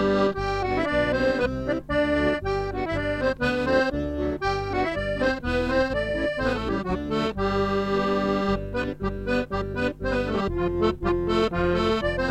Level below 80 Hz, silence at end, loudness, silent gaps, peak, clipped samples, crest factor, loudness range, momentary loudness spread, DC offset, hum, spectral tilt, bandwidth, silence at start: -38 dBFS; 0 s; -25 LUFS; none; -10 dBFS; under 0.1%; 16 dB; 1 LU; 5 LU; under 0.1%; none; -6.5 dB/octave; 12.5 kHz; 0 s